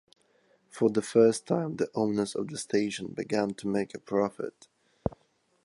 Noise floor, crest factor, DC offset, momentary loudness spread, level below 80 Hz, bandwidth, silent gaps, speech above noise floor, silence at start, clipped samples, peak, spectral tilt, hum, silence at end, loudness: -70 dBFS; 20 dB; under 0.1%; 13 LU; -60 dBFS; 11.5 kHz; none; 42 dB; 0.75 s; under 0.1%; -10 dBFS; -5.5 dB/octave; none; 0.5 s; -29 LUFS